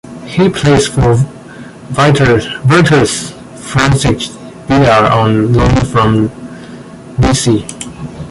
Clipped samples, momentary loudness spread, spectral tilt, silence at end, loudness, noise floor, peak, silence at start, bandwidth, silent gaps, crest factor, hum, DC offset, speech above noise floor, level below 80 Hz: under 0.1%; 20 LU; -5.5 dB/octave; 0 s; -11 LUFS; -30 dBFS; 0 dBFS; 0.05 s; 11.5 kHz; none; 12 dB; none; under 0.1%; 21 dB; -28 dBFS